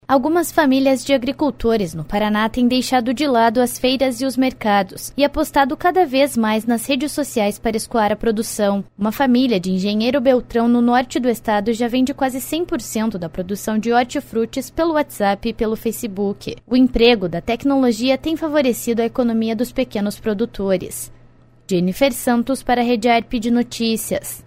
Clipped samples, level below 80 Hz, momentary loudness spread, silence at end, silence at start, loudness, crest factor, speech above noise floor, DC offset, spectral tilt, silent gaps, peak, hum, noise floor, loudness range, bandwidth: under 0.1%; -42 dBFS; 7 LU; 0.05 s; 0.1 s; -18 LUFS; 18 dB; 30 dB; under 0.1%; -4.5 dB/octave; none; 0 dBFS; none; -48 dBFS; 3 LU; 16 kHz